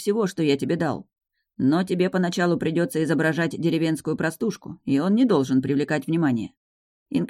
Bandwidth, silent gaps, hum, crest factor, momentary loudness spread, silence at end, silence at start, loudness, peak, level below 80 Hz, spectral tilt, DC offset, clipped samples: 15.5 kHz; 6.57-7.06 s; none; 16 dB; 9 LU; 0 s; 0 s; -23 LUFS; -6 dBFS; -64 dBFS; -6.5 dB/octave; under 0.1%; under 0.1%